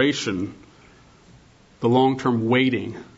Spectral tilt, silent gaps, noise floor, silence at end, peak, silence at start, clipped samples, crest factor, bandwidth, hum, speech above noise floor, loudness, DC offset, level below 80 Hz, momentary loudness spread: -5.5 dB/octave; none; -52 dBFS; 0.15 s; -6 dBFS; 0 s; under 0.1%; 18 dB; 8 kHz; none; 31 dB; -21 LUFS; under 0.1%; -60 dBFS; 10 LU